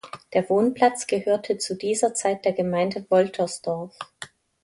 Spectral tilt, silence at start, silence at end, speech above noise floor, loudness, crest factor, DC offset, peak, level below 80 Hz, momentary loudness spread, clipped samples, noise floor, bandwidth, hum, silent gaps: -4.5 dB/octave; 0.05 s; 0.4 s; 21 dB; -24 LUFS; 20 dB; under 0.1%; -4 dBFS; -66 dBFS; 16 LU; under 0.1%; -44 dBFS; 11.5 kHz; none; none